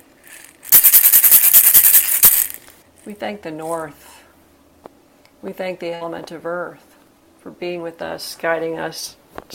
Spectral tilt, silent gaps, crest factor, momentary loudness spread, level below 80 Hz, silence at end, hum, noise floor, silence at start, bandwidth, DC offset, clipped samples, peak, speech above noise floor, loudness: -0.5 dB/octave; none; 18 dB; 23 LU; -56 dBFS; 0 s; none; -52 dBFS; 0.3 s; over 20 kHz; under 0.1%; 0.1%; 0 dBFS; 25 dB; -9 LUFS